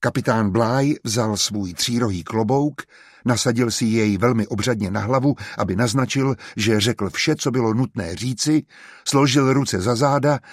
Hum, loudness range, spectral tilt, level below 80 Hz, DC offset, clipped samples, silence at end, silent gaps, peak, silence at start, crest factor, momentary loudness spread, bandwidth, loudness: none; 1 LU; -5 dB/octave; -54 dBFS; under 0.1%; under 0.1%; 0 s; none; -4 dBFS; 0 s; 16 dB; 5 LU; 15 kHz; -20 LUFS